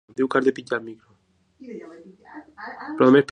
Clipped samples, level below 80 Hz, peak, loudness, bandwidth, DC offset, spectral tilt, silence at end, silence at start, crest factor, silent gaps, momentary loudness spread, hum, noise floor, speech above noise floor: under 0.1%; -68 dBFS; -4 dBFS; -21 LUFS; 9.6 kHz; under 0.1%; -7 dB/octave; 0.1 s; 0.2 s; 20 dB; none; 27 LU; none; -62 dBFS; 41 dB